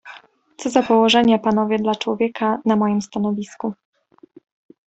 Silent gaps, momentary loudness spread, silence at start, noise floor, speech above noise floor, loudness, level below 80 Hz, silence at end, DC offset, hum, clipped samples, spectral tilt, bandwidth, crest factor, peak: none; 13 LU; 0.05 s; -49 dBFS; 31 dB; -19 LUFS; -60 dBFS; 1.15 s; under 0.1%; none; under 0.1%; -5 dB/octave; 8.2 kHz; 18 dB; -2 dBFS